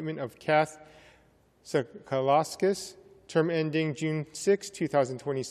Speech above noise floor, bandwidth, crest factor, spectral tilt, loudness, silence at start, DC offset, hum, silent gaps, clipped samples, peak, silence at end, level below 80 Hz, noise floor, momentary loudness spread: 34 dB; 14 kHz; 18 dB; -5.5 dB/octave; -29 LUFS; 0 s; under 0.1%; none; none; under 0.1%; -12 dBFS; 0 s; -70 dBFS; -63 dBFS; 8 LU